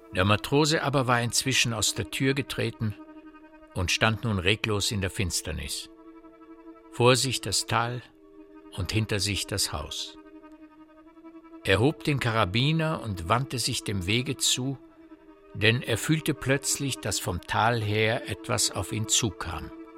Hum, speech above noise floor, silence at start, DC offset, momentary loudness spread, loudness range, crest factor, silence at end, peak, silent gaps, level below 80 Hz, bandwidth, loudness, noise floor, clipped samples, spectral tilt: none; 26 dB; 0 s; under 0.1%; 11 LU; 3 LU; 24 dB; 0 s; -4 dBFS; none; -50 dBFS; 16.5 kHz; -26 LUFS; -52 dBFS; under 0.1%; -3.5 dB/octave